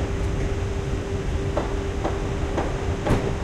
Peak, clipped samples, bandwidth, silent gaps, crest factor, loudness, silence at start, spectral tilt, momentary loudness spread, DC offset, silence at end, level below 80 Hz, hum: -8 dBFS; under 0.1%; 12 kHz; none; 18 dB; -26 LUFS; 0 s; -6.5 dB/octave; 4 LU; under 0.1%; 0 s; -30 dBFS; none